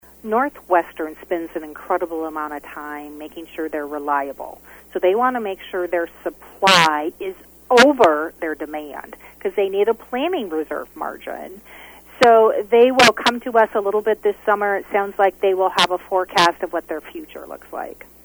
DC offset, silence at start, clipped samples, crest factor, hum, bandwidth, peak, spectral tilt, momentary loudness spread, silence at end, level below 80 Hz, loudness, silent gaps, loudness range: under 0.1%; 0.25 s; under 0.1%; 20 dB; none; over 20 kHz; 0 dBFS; -3 dB/octave; 19 LU; 0.35 s; -56 dBFS; -18 LUFS; none; 9 LU